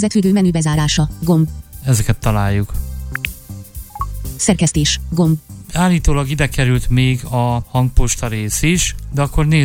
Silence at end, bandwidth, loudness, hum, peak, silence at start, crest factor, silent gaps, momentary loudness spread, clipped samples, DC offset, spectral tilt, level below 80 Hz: 0 s; 17 kHz; -17 LUFS; none; 0 dBFS; 0 s; 16 dB; none; 11 LU; under 0.1%; under 0.1%; -5 dB/octave; -24 dBFS